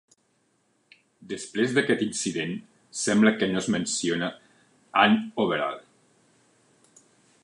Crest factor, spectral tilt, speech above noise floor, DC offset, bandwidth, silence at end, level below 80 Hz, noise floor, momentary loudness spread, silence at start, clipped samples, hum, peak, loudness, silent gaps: 22 dB; -4 dB/octave; 45 dB; under 0.1%; 11 kHz; 1.65 s; -68 dBFS; -69 dBFS; 14 LU; 1.2 s; under 0.1%; none; -4 dBFS; -25 LUFS; none